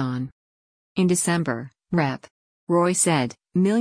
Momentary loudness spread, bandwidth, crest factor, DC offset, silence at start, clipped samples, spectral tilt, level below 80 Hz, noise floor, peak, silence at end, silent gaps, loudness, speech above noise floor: 13 LU; 10.5 kHz; 16 dB; under 0.1%; 0 s; under 0.1%; -5 dB/octave; -62 dBFS; under -90 dBFS; -8 dBFS; 0 s; 0.32-0.95 s, 2.31-2.67 s; -23 LUFS; over 69 dB